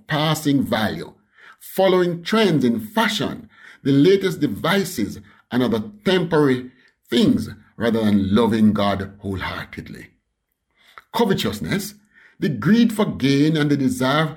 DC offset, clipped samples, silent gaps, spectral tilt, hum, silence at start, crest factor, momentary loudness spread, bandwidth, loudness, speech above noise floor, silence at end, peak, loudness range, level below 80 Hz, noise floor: under 0.1%; under 0.1%; none; -6 dB/octave; none; 0.1 s; 14 dB; 12 LU; 18.5 kHz; -20 LUFS; 55 dB; 0 s; -6 dBFS; 4 LU; -52 dBFS; -74 dBFS